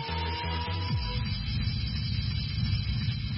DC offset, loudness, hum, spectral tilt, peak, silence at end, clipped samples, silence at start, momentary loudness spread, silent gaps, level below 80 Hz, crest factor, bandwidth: under 0.1%; -31 LUFS; none; -4.5 dB/octave; -18 dBFS; 0 s; under 0.1%; 0 s; 2 LU; none; -36 dBFS; 12 dB; 5.8 kHz